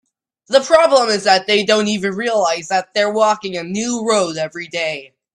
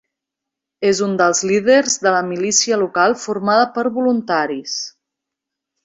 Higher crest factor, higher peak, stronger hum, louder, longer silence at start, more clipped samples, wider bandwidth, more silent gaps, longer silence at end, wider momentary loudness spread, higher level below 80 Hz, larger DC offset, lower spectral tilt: about the same, 16 dB vs 16 dB; about the same, 0 dBFS vs -2 dBFS; neither; about the same, -16 LUFS vs -16 LUFS; second, 0.5 s vs 0.8 s; neither; first, 11.5 kHz vs 8.4 kHz; neither; second, 0.3 s vs 0.95 s; about the same, 10 LU vs 8 LU; about the same, -60 dBFS vs -62 dBFS; neither; about the same, -3 dB/octave vs -3 dB/octave